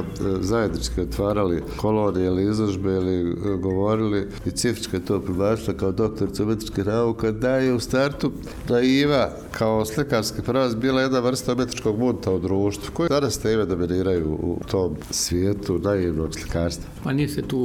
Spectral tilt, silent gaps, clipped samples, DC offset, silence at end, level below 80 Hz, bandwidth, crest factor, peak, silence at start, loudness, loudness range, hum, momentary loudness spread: -5.5 dB/octave; none; under 0.1%; under 0.1%; 0 s; -40 dBFS; 17.5 kHz; 14 dB; -8 dBFS; 0 s; -23 LUFS; 2 LU; none; 5 LU